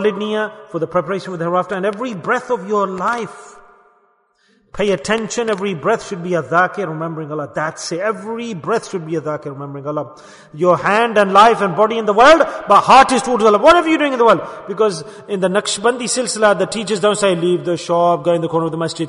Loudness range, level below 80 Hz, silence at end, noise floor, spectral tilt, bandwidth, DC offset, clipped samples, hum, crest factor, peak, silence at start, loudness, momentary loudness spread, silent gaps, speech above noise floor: 10 LU; -50 dBFS; 0 s; -58 dBFS; -4.5 dB/octave; 11 kHz; under 0.1%; under 0.1%; none; 16 dB; 0 dBFS; 0 s; -16 LUFS; 14 LU; none; 43 dB